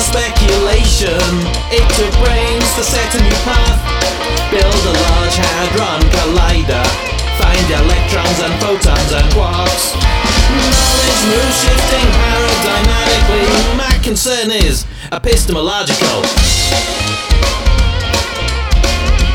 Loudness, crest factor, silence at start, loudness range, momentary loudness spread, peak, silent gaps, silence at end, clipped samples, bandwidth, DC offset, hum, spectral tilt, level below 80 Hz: -12 LUFS; 12 dB; 0 s; 2 LU; 4 LU; 0 dBFS; none; 0 s; under 0.1%; 18 kHz; under 0.1%; none; -3.5 dB/octave; -14 dBFS